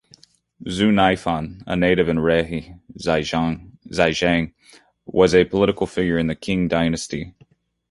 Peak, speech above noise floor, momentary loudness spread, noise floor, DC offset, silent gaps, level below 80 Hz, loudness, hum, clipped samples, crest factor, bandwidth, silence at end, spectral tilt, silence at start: -2 dBFS; 36 dB; 13 LU; -56 dBFS; under 0.1%; none; -42 dBFS; -20 LUFS; none; under 0.1%; 18 dB; 11.5 kHz; 0.6 s; -5.5 dB/octave; 0.6 s